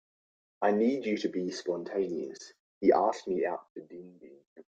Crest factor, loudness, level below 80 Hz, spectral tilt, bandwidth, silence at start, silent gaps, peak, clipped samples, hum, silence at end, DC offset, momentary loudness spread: 20 dB; -30 LUFS; -74 dBFS; -5.5 dB/octave; 8.8 kHz; 0.6 s; 2.59-2.81 s, 3.70-3.76 s, 4.47-4.56 s; -12 dBFS; under 0.1%; none; 0.15 s; under 0.1%; 21 LU